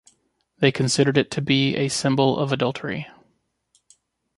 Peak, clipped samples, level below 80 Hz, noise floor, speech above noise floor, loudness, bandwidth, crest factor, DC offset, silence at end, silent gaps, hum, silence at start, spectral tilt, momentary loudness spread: -2 dBFS; under 0.1%; -60 dBFS; -68 dBFS; 47 dB; -21 LUFS; 11.5 kHz; 20 dB; under 0.1%; 1.3 s; none; none; 0.6 s; -5 dB/octave; 11 LU